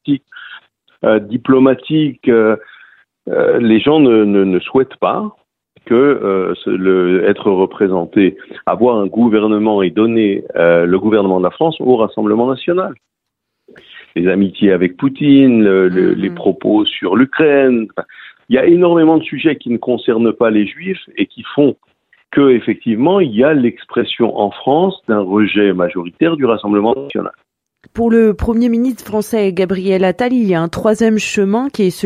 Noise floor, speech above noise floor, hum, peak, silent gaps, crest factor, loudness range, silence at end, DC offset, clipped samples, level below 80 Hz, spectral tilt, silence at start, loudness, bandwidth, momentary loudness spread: -57 dBFS; 45 dB; none; 0 dBFS; none; 12 dB; 3 LU; 0 s; under 0.1%; under 0.1%; -46 dBFS; -7 dB/octave; 0.05 s; -13 LUFS; 14.5 kHz; 9 LU